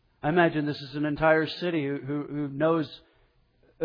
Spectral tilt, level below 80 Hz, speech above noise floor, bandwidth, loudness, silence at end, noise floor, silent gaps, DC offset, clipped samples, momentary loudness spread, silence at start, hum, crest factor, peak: -8.5 dB/octave; -58 dBFS; 38 dB; 5.2 kHz; -27 LUFS; 0 s; -64 dBFS; none; under 0.1%; under 0.1%; 9 LU; 0.25 s; none; 18 dB; -10 dBFS